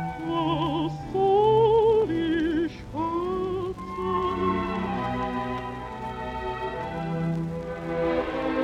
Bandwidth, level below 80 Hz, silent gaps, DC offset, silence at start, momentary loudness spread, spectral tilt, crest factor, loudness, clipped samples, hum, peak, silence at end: 9.6 kHz; -46 dBFS; none; under 0.1%; 0 s; 12 LU; -7.5 dB/octave; 16 dB; -26 LUFS; under 0.1%; none; -10 dBFS; 0 s